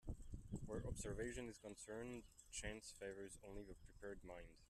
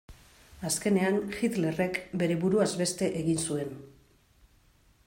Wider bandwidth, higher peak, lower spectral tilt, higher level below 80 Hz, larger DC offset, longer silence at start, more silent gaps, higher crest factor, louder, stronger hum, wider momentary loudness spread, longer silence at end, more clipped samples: second, 13.5 kHz vs 16.5 kHz; second, -34 dBFS vs -14 dBFS; about the same, -4.5 dB/octave vs -5 dB/octave; about the same, -60 dBFS vs -60 dBFS; neither; about the same, 0.05 s vs 0.1 s; neither; about the same, 18 dB vs 18 dB; second, -53 LUFS vs -29 LUFS; neither; about the same, 9 LU vs 8 LU; second, 0.05 s vs 1.2 s; neither